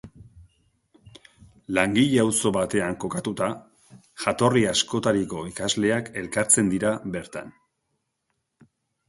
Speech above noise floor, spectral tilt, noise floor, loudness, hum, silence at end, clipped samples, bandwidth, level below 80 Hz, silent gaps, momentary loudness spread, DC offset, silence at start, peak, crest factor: 54 dB; -4 dB/octave; -77 dBFS; -23 LUFS; none; 1.6 s; under 0.1%; 12 kHz; -56 dBFS; none; 11 LU; under 0.1%; 0.05 s; -2 dBFS; 22 dB